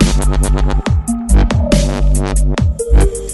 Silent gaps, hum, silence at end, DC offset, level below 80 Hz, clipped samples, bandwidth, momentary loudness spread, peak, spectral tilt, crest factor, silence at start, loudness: none; none; 0 s; under 0.1%; -14 dBFS; under 0.1%; 12 kHz; 3 LU; 0 dBFS; -5.5 dB/octave; 12 dB; 0 s; -14 LUFS